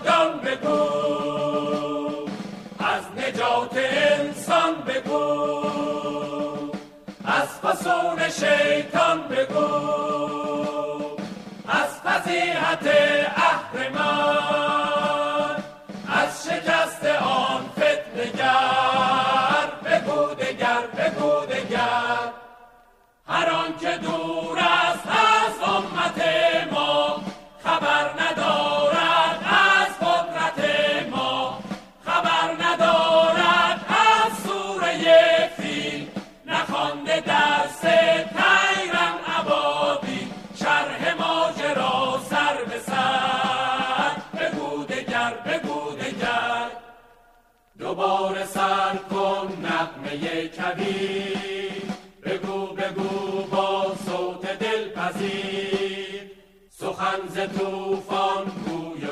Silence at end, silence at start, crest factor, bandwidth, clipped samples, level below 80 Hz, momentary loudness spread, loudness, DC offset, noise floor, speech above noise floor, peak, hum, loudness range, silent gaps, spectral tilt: 0 s; 0 s; 20 dB; 14.5 kHz; under 0.1%; -60 dBFS; 11 LU; -22 LUFS; under 0.1%; -58 dBFS; 37 dB; -4 dBFS; none; 7 LU; none; -3.5 dB/octave